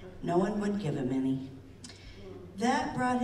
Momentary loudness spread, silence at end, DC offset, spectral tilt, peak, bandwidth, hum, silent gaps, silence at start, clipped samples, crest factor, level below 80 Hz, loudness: 19 LU; 0 s; under 0.1%; -6 dB/octave; -16 dBFS; 12 kHz; none; none; 0 s; under 0.1%; 16 dB; -54 dBFS; -31 LUFS